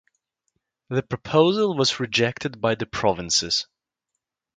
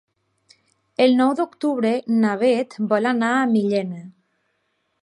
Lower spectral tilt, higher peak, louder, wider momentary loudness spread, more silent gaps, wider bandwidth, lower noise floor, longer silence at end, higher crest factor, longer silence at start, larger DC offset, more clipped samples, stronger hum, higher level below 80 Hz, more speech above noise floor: second, -3.5 dB/octave vs -6 dB/octave; about the same, -4 dBFS vs -4 dBFS; about the same, -22 LUFS vs -20 LUFS; about the same, 8 LU vs 7 LU; neither; second, 9.4 kHz vs 11 kHz; first, -82 dBFS vs -71 dBFS; about the same, 0.95 s vs 0.95 s; about the same, 20 dB vs 16 dB; about the same, 0.9 s vs 1 s; neither; neither; neither; first, -54 dBFS vs -74 dBFS; first, 60 dB vs 52 dB